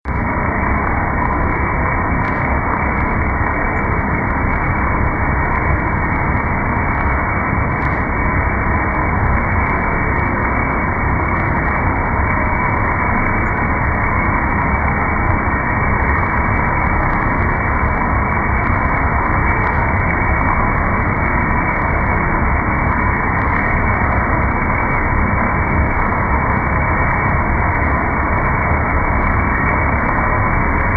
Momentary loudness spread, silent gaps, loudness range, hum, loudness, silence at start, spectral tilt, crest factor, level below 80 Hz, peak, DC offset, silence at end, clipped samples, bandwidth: 2 LU; none; 1 LU; none; -16 LUFS; 0.05 s; -10.5 dB/octave; 14 dB; -22 dBFS; -2 dBFS; under 0.1%; 0 s; under 0.1%; 4.1 kHz